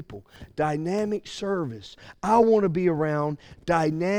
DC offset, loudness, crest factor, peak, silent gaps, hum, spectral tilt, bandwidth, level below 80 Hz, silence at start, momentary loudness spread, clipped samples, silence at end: under 0.1%; -25 LUFS; 18 dB; -6 dBFS; none; none; -7 dB/octave; 11 kHz; -54 dBFS; 0 s; 20 LU; under 0.1%; 0 s